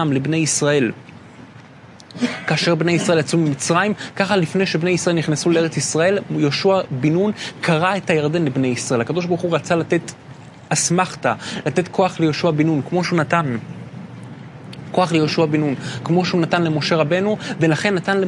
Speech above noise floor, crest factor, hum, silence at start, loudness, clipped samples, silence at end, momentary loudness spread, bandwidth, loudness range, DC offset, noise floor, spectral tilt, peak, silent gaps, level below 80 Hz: 24 dB; 18 dB; none; 0 s; -19 LUFS; under 0.1%; 0 s; 8 LU; 11.5 kHz; 2 LU; under 0.1%; -42 dBFS; -5 dB/octave; 0 dBFS; none; -62 dBFS